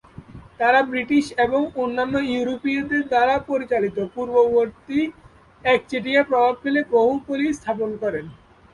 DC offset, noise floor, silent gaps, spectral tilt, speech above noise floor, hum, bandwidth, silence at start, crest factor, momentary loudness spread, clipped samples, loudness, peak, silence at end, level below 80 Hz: under 0.1%; -42 dBFS; none; -5.5 dB/octave; 21 dB; none; 11.5 kHz; 0.2 s; 18 dB; 8 LU; under 0.1%; -21 LUFS; -4 dBFS; 0.4 s; -54 dBFS